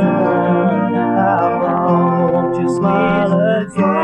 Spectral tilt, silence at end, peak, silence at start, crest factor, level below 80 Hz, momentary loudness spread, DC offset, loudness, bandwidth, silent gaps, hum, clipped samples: -8.5 dB/octave; 0 s; -2 dBFS; 0 s; 12 dB; -50 dBFS; 2 LU; under 0.1%; -15 LUFS; 9 kHz; none; none; under 0.1%